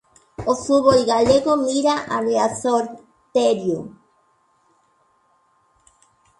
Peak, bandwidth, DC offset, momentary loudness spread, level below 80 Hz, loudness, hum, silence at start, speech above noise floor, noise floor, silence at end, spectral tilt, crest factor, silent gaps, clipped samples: -2 dBFS; 11.5 kHz; under 0.1%; 13 LU; -54 dBFS; -19 LUFS; none; 0.4 s; 44 dB; -62 dBFS; 2.5 s; -4.5 dB/octave; 20 dB; none; under 0.1%